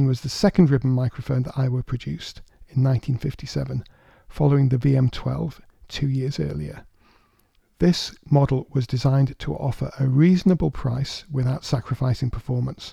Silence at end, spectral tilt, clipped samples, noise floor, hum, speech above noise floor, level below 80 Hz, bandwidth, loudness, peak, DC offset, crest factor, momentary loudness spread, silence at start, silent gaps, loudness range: 0 s; -7.5 dB/octave; under 0.1%; -62 dBFS; none; 41 dB; -42 dBFS; 10.5 kHz; -23 LUFS; -4 dBFS; under 0.1%; 18 dB; 11 LU; 0 s; none; 5 LU